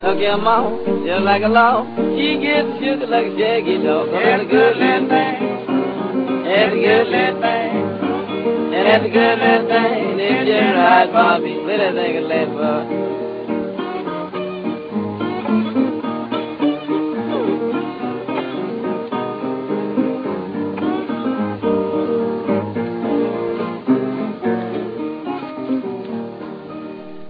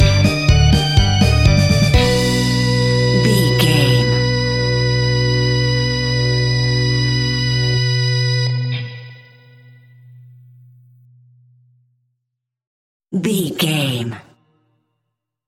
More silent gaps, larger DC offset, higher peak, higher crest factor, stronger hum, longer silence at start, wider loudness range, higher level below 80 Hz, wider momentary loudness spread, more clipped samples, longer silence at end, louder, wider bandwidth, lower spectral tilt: second, none vs 12.67-13.00 s; neither; about the same, 0 dBFS vs -2 dBFS; about the same, 18 dB vs 16 dB; neither; about the same, 0 s vs 0 s; second, 7 LU vs 11 LU; second, -60 dBFS vs -28 dBFS; first, 11 LU vs 7 LU; neither; second, 0 s vs 1.3 s; second, -18 LUFS vs -15 LUFS; second, 5.2 kHz vs 15 kHz; first, -8.5 dB/octave vs -5.5 dB/octave